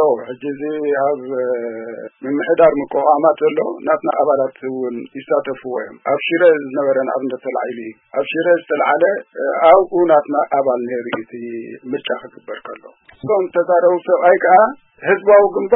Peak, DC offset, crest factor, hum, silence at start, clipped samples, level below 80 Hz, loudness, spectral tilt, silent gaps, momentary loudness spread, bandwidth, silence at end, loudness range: 0 dBFS; under 0.1%; 16 dB; none; 0 s; under 0.1%; -60 dBFS; -16 LUFS; -9.5 dB/octave; none; 17 LU; 3.9 kHz; 0 s; 4 LU